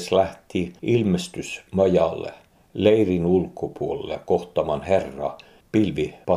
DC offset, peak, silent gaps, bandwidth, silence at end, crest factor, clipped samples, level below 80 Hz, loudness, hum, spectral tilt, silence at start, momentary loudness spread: under 0.1%; -4 dBFS; none; 13.5 kHz; 0 s; 20 dB; under 0.1%; -50 dBFS; -23 LUFS; none; -6.5 dB/octave; 0 s; 12 LU